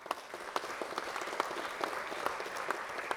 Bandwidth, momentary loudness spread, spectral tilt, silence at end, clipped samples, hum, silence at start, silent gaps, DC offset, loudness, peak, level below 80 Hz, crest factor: over 20 kHz; 3 LU; -2 dB/octave; 0 s; under 0.1%; none; 0 s; none; under 0.1%; -38 LUFS; -12 dBFS; -74 dBFS; 26 dB